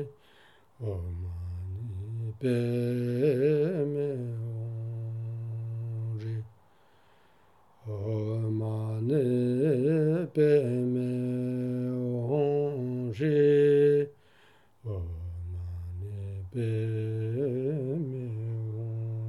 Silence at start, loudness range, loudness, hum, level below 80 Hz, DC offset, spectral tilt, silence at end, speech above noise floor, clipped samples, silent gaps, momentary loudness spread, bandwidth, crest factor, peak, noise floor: 0 s; 9 LU; -30 LUFS; none; -56 dBFS; under 0.1%; -9.5 dB/octave; 0 s; 36 dB; under 0.1%; none; 14 LU; 12 kHz; 18 dB; -12 dBFS; -63 dBFS